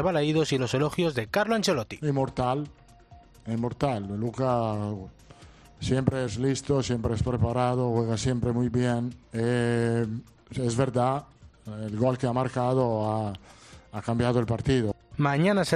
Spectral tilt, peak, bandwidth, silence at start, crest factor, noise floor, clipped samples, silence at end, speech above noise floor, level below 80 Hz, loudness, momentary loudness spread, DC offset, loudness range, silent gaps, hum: -6.5 dB/octave; -6 dBFS; 13.5 kHz; 0 s; 22 dB; -52 dBFS; under 0.1%; 0 s; 26 dB; -50 dBFS; -27 LUFS; 10 LU; under 0.1%; 3 LU; none; none